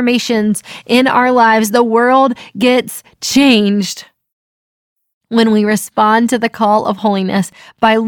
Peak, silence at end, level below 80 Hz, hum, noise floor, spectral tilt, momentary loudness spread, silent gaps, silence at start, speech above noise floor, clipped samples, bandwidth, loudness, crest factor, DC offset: 0 dBFS; 0 s; -56 dBFS; none; under -90 dBFS; -4.5 dB/octave; 8 LU; 4.33-4.96 s, 5.14-5.21 s; 0 s; over 78 dB; under 0.1%; 18.5 kHz; -12 LUFS; 12 dB; under 0.1%